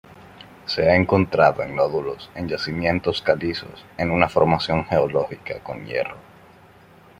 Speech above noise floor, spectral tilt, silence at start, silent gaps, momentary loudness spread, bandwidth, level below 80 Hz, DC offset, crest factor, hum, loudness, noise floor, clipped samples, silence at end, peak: 28 dB; -7 dB/octave; 0.2 s; none; 14 LU; 14.5 kHz; -50 dBFS; under 0.1%; 20 dB; none; -21 LUFS; -49 dBFS; under 0.1%; 1 s; -2 dBFS